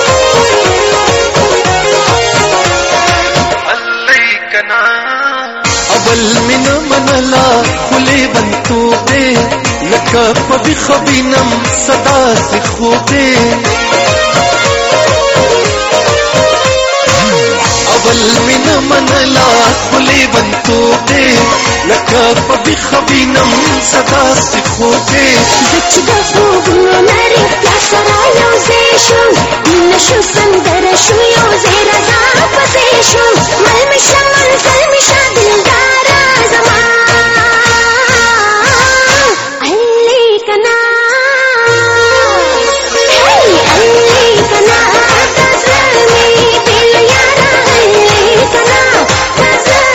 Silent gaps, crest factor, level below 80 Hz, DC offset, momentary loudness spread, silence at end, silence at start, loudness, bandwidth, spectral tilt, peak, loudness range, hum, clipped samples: none; 8 dB; -30 dBFS; 0.3%; 4 LU; 0 s; 0 s; -7 LUFS; over 20 kHz; -2.5 dB/octave; 0 dBFS; 3 LU; none; 1%